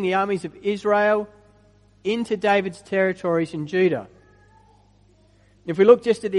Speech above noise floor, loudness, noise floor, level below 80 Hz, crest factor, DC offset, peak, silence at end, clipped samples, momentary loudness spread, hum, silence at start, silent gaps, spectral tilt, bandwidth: 36 dB; -21 LUFS; -56 dBFS; -60 dBFS; 22 dB; under 0.1%; 0 dBFS; 0 s; under 0.1%; 14 LU; 50 Hz at -55 dBFS; 0 s; none; -6.5 dB/octave; 11 kHz